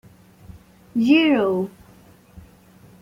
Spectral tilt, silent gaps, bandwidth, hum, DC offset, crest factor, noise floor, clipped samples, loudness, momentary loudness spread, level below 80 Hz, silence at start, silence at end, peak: -6.5 dB/octave; none; 15 kHz; none; under 0.1%; 18 dB; -50 dBFS; under 0.1%; -19 LUFS; 13 LU; -56 dBFS; 0.95 s; 1.3 s; -4 dBFS